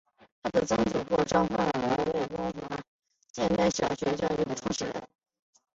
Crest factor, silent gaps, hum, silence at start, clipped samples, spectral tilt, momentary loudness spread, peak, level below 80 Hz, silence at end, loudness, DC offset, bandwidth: 20 dB; 2.88-2.99 s, 3.30-3.34 s; none; 0.45 s; under 0.1%; -5 dB/octave; 12 LU; -10 dBFS; -54 dBFS; 0.7 s; -29 LUFS; under 0.1%; 8 kHz